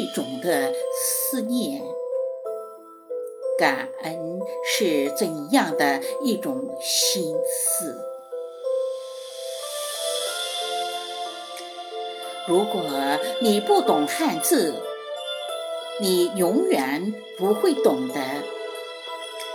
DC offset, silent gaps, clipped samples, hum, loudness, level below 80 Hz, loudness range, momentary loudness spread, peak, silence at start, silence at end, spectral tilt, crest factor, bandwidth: under 0.1%; none; under 0.1%; none; -24 LUFS; under -90 dBFS; 6 LU; 13 LU; -6 dBFS; 0 s; 0 s; -3 dB/octave; 20 dB; over 20 kHz